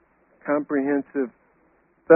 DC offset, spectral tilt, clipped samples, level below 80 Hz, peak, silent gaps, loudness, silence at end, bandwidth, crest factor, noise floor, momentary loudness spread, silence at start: under 0.1%; -1.5 dB/octave; under 0.1%; -72 dBFS; -2 dBFS; none; -26 LUFS; 0 s; 2.8 kHz; 22 dB; -62 dBFS; 8 LU; 0.45 s